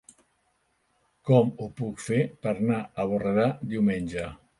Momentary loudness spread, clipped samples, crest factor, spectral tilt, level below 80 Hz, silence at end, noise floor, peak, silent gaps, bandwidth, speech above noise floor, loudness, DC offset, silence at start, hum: 12 LU; under 0.1%; 20 dB; -7.5 dB/octave; -56 dBFS; 0.25 s; -71 dBFS; -6 dBFS; none; 11.5 kHz; 46 dB; -27 LUFS; under 0.1%; 1.25 s; none